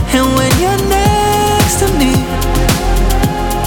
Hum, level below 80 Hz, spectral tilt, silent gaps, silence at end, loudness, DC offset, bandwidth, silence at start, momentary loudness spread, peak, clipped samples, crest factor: none; -18 dBFS; -4.5 dB/octave; none; 0 s; -12 LUFS; under 0.1%; 19.5 kHz; 0 s; 3 LU; 0 dBFS; under 0.1%; 12 dB